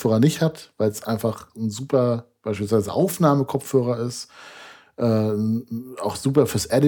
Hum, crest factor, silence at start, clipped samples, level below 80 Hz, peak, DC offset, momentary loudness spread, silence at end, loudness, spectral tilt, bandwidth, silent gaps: none; 18 dB; 0 s; under 0.1%; -58 dBFS; -4 dBFS; under 0.1%; 13 LU; 0 s; -23 LUFS; -6.5 dB/octave; 19 kHz; none